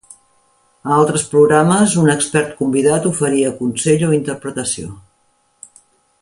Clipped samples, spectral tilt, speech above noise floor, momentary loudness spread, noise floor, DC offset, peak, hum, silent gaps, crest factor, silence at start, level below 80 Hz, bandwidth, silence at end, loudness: under 0.1%; -5 dB/octave; 46 dB; 10 LU; -60 dBFS; under 0.1%; 0 dBFS; none; none; 16 dB; 0.85 s; -52 dBFS; 11.5 kHz; 1.2 s; -15 LUFS